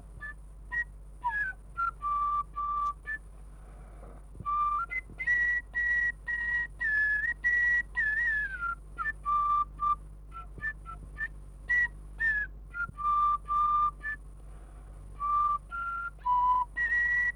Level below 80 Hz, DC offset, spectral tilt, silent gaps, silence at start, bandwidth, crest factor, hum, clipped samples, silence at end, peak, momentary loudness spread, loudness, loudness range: -48 dBFS; under 0.1%; -4 dB/octave; none; 0 s; 11 kHz; 12 dB; none; under 0.1%; 0 s; -20 dBFS; 17 LU; -30 LUFS; 6 LU